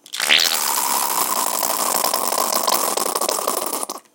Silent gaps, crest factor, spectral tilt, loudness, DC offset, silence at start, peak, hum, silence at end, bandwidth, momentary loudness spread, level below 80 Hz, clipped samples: none; 18 dB; 1 dB/octave; -18 LUFS; under 0.1%; 0.1 s; -2 dBFS; none; 0.15 s; 18 kHz; 7 LU; -74 dBFS; under 0.1%